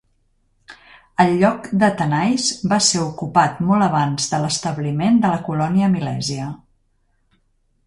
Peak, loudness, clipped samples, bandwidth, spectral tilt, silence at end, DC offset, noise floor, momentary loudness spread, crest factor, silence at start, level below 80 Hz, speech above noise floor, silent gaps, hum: -2 dBFS; -18 LUFS; under 0.1%; 11.5 kHz; -4.5 dB/octave; 1.3 s; under 0.1%; -63 dBFS; 8 LU; 18 dB; 0.7 s; -54 dBFS; 45 dB; none; none